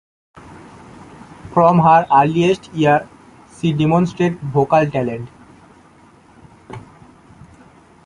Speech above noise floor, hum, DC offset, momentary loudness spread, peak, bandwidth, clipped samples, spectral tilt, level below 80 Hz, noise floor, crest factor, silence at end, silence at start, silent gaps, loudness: 33 dB; none; under 0.1%; 25 LU; -2 dBFS; 10.5 kHz; under 0.1%; -7.5 dB/octave; -50 dBFS; -48 dBFS; 18 dB; 1.25 s; 0.5 s; none; -15 LUFS